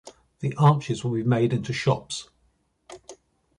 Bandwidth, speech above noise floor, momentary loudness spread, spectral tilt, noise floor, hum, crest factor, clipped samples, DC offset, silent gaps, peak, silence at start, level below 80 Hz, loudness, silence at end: 11 kHz; 45 dB; 21 LU; -6.5 dB/octave; -68 dBFS; none; 20 dB; under 0.1%; under 0.1%; none; -6 dBFS; 0.05 s; -58 dBFS; -24 LUFS; 0.45 s